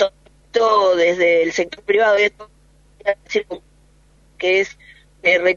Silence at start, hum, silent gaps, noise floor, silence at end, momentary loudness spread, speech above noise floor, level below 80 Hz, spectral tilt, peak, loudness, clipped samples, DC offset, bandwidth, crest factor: 0 s; none; none; -53 dBFS; 0 s; 9 LU; 36 dB; -54 dBFS; -3.5 dB/octave; -2 dBFS; -18 LUFS; under 0.1%; under 0.1%; 7.4 kHz; 16 dB